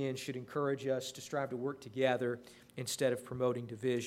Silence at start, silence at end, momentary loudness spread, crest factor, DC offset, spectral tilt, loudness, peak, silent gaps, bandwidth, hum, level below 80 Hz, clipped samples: 0 s; 0 s; 8 LU; 20 dB; under 0.1%; -5 dB/octave; -37 LUFS; -16 dBFS; none; 16 kHz; none; -74 dBFS; under 0.1%